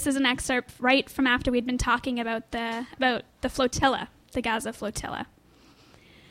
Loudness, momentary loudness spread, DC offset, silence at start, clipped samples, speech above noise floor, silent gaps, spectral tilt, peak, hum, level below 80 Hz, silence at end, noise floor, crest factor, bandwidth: -26 LUFS; 10 LU; under 0.1%; 0 s; under 0.1%; 30 dB; none; -3.5 dB/octave; -8 dBFS; none; -46 dBFS; 1.05 s; -56 dBFS; 20 dB; 16 kHz